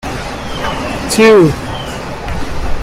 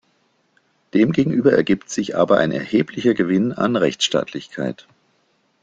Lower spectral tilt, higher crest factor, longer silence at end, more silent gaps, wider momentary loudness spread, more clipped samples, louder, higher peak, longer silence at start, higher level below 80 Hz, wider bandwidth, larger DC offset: about the same, -5 dB/octave vs -5.5 dB/octave; about the same, 14 dB vs 18 dB; second, 0 s vs 0.9 s; neither; first, 15 LU vs 11 LU; neither; first, -14 LUFS vs -19 LUFS; about the same, 0 dBFS vs -2 dBFS; second, 0.05 s vs 0.95 s; first, -26 dBFS vs -56 dBFS; first, 16 kHz vs 9.2 kHz; neither